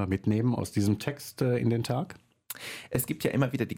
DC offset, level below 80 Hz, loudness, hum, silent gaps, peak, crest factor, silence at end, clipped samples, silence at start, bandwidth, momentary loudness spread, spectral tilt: under 0.1%; -58 dBFS; -29 LUFS; none; none; -14 dBFS; 16 dB; 0 s; under 0.1%; 0 s; 17 kHz; 11 LU; -6.5 dB/octave